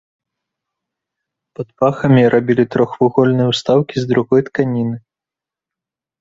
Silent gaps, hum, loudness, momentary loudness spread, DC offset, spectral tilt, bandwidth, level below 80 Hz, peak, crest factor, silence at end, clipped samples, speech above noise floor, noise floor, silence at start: none; none; -15 LUFS; 10 LU; under 0.1%; -7.5 dB/octave; 7.8 kHz; -54 dBFS; -2 dBFS; 16 dB; 1.2 s; under 0.1%; 73 dB; -87 dBFS; 1.6 s